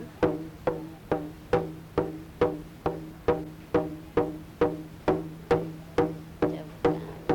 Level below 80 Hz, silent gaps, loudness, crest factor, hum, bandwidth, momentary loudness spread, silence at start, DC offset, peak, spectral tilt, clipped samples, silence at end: -50 dBFS; none; -30 LUFS; 18 dB; none; 18 kHz; 5 LU; 0 s; under 0.1%; -12 dBFS; -7.5 dB/octave; under 0.1%; 0 s